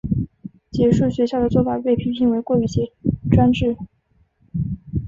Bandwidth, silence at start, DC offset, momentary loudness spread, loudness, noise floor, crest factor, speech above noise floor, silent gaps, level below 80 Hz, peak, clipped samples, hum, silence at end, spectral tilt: 7.6 kHz; 0.05 s; under 0.1%; 14 LU; -20 LUFS; -61 dBFS; 18 dB; 43 dB; none; -36 dBFS; -2 dBFS; under 0.1%; none; 0 s; -8.5 dB/octave